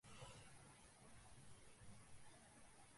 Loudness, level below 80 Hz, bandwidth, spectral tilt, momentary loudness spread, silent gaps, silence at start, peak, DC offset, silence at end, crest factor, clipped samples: -65 LUFS; -74 dBFS; 11.5 kHz; -3.5 dB/octave; 5 LU; none; 0.05 s; -46 dBFS; under 0.1%; 0 s; 16 dB; under 0.1%